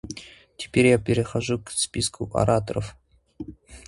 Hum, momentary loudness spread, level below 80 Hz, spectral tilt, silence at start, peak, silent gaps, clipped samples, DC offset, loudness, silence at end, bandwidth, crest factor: none; 21 LU; -46 dBFS; -5 dB/octave; 0.05 s; -6 dBFS; none; under 0.1%; under 0.1%; -23 LUFS; 0.05 s; 11.5 kHz; 20 dB